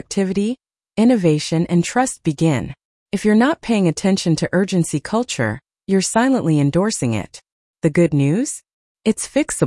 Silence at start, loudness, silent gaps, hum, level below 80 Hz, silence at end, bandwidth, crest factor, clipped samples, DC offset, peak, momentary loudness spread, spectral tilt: 0.1 s; -18 LUFS; 2.85-3.06 s, 7.52-7.74 s, 8.73-8.95 s; none; -50 dBFS; 0 s; 12 kHz; 14 dB; under 0.1%; under 0.1%; -4 dBFS; 9 LU; -5.5 dB/octave